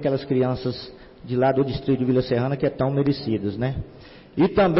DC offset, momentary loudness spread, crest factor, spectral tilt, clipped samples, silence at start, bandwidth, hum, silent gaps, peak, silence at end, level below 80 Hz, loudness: under 0.1%; 13 LU; 12 dB; -11.5 dB/octave; under 0.1%; 0 s; 5.8 kHz; none; none; -10 dBFS; 0 s; -46 dBFS; -23 LUFS